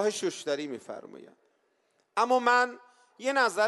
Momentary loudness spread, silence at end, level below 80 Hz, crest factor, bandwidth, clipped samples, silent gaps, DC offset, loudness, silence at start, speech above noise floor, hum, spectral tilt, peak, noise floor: 19 LU; 0 s; -88 dBFS; 20 dB; 12 kHz; under 0.1%; none; under 0.1%; -28 LUFS; 0 s; 44 dB; none; -2.5 dB/octave; -10 dBFS; -72 dBFS